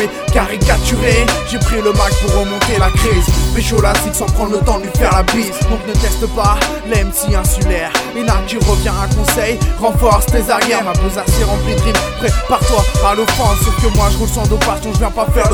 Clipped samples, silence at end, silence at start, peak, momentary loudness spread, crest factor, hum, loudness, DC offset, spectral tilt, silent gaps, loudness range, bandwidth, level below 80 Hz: under 0.1%; 0 s; 0 s; 0 dBFS; 4 LU; 12 dB; none; -14 LUFS; under 0.1%; -4.5 dB/octave; none; 1 LU; 18 kHz; -16 dBFS